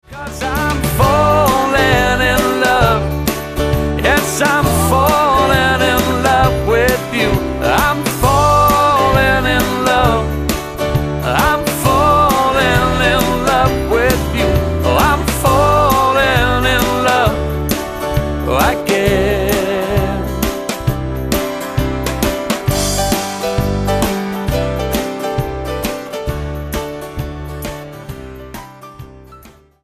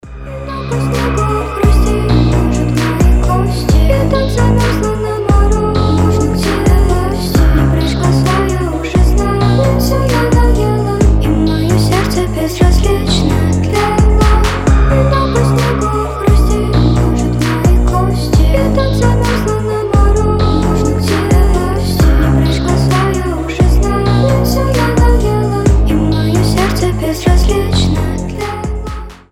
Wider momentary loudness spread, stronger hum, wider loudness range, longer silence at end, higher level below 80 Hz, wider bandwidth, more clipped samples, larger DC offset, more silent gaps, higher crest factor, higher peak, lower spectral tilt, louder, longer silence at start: first, 11 LU vs 4 LU; neither; first, 8 LU vs 1 LU; first, 0.35 s vs 0.15 s; second, -24 dBFS vs -14 dBFS; about the same, 15.5 kHz vs 15.5 kHz; neither; neither; neither; about the same, 14 dB vs 10 dB; about the same, 0 dBFS vs 0 dBFS; second, -4.5 dB/octave vs -6.5 dB/octave; about the same, -14 LUFS vs -12 LUFS; about the same, 0.1 s vs 0.05 s